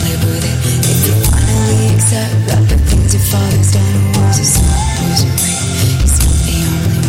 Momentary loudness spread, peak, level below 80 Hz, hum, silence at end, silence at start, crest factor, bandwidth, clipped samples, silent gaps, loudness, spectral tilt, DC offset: 3 LU; 0 dBFS; -18 dBFS; none; 0 s; 0 s; 10 dB; 16.5 kHz; under 0.1%; none; -12 LUFS; -4.5 dB/octave; under 0.1%